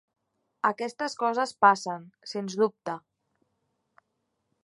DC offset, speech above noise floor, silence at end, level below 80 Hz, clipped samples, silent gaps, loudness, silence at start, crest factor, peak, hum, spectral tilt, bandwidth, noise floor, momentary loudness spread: under 0.1%; 52 dB; 1.65 s; -84 dBFS; under 0.1%; none; -27 LUFS; 0.65 s; 24 dB; -6 dBFS; none; -4 dB/octave; 11.5 kHz; -79 dBFS; 15 LU